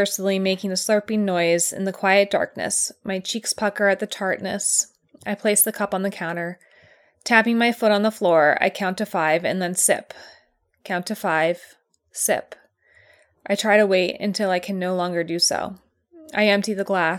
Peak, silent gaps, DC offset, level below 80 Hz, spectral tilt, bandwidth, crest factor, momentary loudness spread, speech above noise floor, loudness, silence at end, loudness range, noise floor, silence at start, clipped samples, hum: -2 dBFS; none; under 0.1%; -68 dBFS; -3 dB/octave; 19 kHz; 20 dB; 10 LU; 39 dB; -21 LUFS; 0 s; 4 LU; -60 dBFS; 0 s; under 0.1%; none